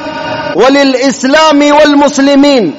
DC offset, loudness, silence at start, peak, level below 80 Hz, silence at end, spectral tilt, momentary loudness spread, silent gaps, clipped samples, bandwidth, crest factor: under 0.1%; -6 LUFS; 0 s; 0 dBFS; -44 dBFS; 0 s; -3.5 dB/octave; 8 LU; none; 0.9%; 8 kHz; 6 dB